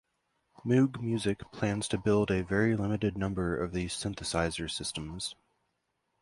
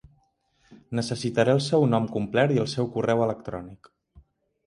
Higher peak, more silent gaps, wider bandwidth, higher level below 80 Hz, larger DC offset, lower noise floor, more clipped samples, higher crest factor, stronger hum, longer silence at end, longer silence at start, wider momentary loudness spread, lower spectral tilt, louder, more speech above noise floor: second, -14 dBFS vs -8 dBFS; neither; about the same, 11.5 kHz vs 11.5 kHz; first, -50 dBFS vs -58 dBFS; neither; first, -80 dBFS vs -67 dBFS; neither; about the same, 18 dB vs 18 dB; neither; first, 0.9 s vs 0.45 s; about the same, 0.65 s vs 0.7 s; second, 9 LU vs 13 LU; about the same, -5.5 dB/octave vs -6.5 dB/octave; second, -31 LUFS vs -25 LUFS; first, 49 dB vs 43 dB